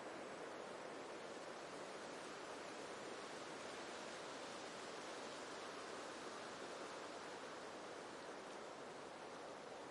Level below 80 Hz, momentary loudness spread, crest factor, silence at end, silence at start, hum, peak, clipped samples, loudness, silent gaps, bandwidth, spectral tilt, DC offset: -88 dBFS; 2 LU; 14 dB; 0 s; 0 s; none; -38 dBFS; under 0.1%; -52 LUFS; none; 11.5 kHz; -2.5 dB/octave; under 0.1%